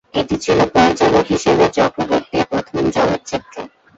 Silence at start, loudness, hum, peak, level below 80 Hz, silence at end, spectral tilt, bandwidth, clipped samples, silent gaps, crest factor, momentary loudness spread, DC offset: 0.15 s; -16 LUFS; none; 0 dBFS; -42 dBFS; 0.3 s; -5 dB/octave; 8 kHz; under 0.1%; none; 16 dB; 11 LU; under 0.1%